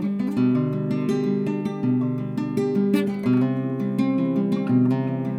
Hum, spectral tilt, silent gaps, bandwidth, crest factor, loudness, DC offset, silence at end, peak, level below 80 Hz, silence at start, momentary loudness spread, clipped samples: none; -9 dB/octave; none; 12.5 kHz; 14 dB; -23 LUFS; under 0.1%; 0 s; -8 dBFS; -64 dBFS; 0 s; 4 LU; under 0.1%